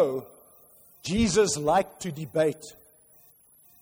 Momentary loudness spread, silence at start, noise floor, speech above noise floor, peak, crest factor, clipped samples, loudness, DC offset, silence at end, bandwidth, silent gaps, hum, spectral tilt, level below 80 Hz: 16 LU; 0 s; -58 dBFS; 32 dB; -12 dBFS; 16 dB; under 0.1%; -26 LUFS; under 0.1%; 1.1 s; over 20 kHz; none; none; -4.5 dB/octave; -50 dBFS